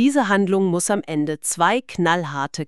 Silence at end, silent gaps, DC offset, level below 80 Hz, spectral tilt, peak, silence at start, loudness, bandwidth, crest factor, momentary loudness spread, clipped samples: 0.05 s; none; 0.3%; -62 dBFS; -4.5 dB/octave; -4 dBFS; 0 s; -20 LUFS; 13.5 kHz; 16 dB; 5 LU; under 0.1%